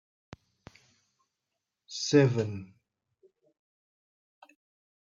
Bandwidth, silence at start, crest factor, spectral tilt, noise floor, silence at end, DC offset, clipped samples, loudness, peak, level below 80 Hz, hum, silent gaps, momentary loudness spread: 7.6 kHz; 1.9 s; 22 dB; -5.5 dB/octave; -86 dBFS; 2.4 s; under 0.1%; under 0.1%; -27 LUFS; -12 dBFS; -72 dBFS; none; none; 18 LU